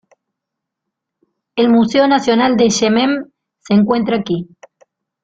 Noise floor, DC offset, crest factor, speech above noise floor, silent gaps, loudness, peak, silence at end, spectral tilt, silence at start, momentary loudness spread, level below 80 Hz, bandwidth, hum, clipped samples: -80 dBFS; under 0.1%; 14 dB; 67 dB; none; -14 LUFS; -2 dBFS; 0.8 s; -5 dB/octave; 1.55 s; 11 LU; -54 dBFS; 7.8 kHz; none; under 0.1%